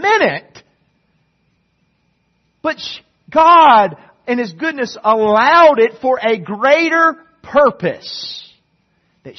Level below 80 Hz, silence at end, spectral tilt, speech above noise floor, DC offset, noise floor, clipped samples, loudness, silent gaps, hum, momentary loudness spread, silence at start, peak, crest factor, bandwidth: -58 dBFS; 0.05 s; -4.5 dB/octave; 50 dB; under 0.1%; -63 dBFS; under 0.1%; -13 LUFS; none; none; 18 LU; 0 s; 0 dBFS; 14 dB; 6.4 kHz